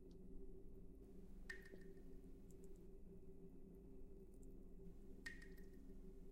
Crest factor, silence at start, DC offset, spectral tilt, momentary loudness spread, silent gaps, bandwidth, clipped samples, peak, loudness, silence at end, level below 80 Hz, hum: 18 dB; 0 s; under 0.1%; -6 dB/octave; 6 LU; none; 16 kHz; under 0.1%; -38 dBFS; -62 LUFS; 0 s; -60 dBFS; none